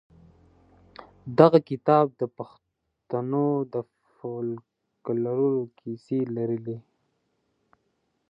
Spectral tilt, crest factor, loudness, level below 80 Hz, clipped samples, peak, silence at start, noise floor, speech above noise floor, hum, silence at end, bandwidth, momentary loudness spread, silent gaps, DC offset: -10 dB/octave; 26 dB; -25 LUFS; -68 dBFS; under 0.1%; -2 dBFS; 1 s; -74 dBFS; 50 dB; none; 1.5 s; 5.6 kHz; 21 LU; none; under 0.1%